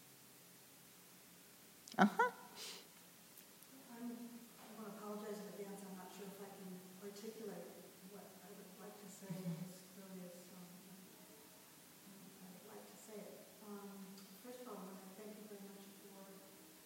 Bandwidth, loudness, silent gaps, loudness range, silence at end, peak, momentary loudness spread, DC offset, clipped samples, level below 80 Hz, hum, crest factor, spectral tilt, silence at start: over 20 kHz; -48 LUFS; none; 14 LU; 0 s; -16 dBFS; 12 LU; under 0.1%; under 0.1%; under -90 dBFS; none; 32 dB; -4.5 dB/octave; 0 s